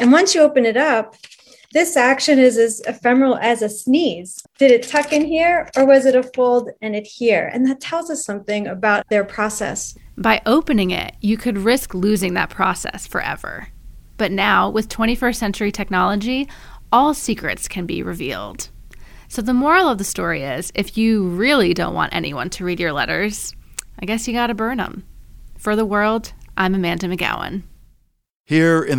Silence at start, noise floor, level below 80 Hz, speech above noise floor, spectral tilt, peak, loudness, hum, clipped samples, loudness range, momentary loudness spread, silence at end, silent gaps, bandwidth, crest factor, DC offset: 0 s; -56 dBFS; -42 dBFS; 38 dB; -4.5 dB/octave; -2 dBFS; -18 LUFS; none; under 0.1%; 6 LU; 12 LU; 0 s; 28.40-28.44 s; 18.5 kHz; 16 dB; under 0.1%